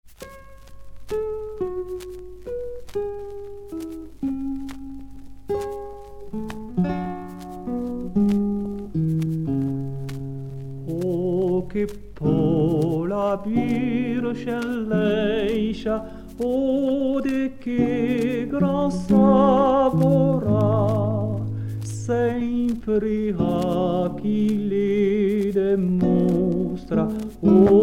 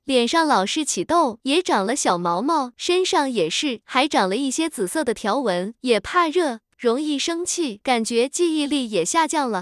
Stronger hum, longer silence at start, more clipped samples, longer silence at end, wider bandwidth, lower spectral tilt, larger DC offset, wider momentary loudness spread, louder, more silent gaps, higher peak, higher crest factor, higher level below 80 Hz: neither; about the same, 0.05 s vs 0.05 s; neither; about the same, 0 s vs 0 s; first, 14.5 kHz vs 12 kHz; first, -8.5 dB/octave vs -3 dB/octave; neither; first, 15 LU vs 4 LU; about the same, -23 LUFS vs -21 LUFS; neither; about the same, -4 dBFS vs -4 dBFS; about the same, 18 dB vs 18 dB; first, -44 dBFS vs -60 dBFS